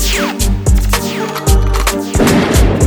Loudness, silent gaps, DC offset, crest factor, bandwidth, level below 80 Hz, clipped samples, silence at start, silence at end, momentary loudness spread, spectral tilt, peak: -13 LUFS; none; under 0.1%; 12 dB; over 20 kHz; -14 dBFS; under 0.1%; 0 s; 0 s; 5 LU; -4.5 dB/octave; 0 dBFS